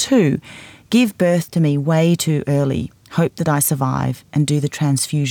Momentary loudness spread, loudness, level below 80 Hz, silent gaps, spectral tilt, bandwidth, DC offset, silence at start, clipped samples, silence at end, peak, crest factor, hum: 7 LU; -18 LUFS; -52 dBFS; none; -5.5 dB/octave; 20 kHz; under 0.1%; 0 s; under 0.1%; 0 s; -4 dBFS; 14 dB; none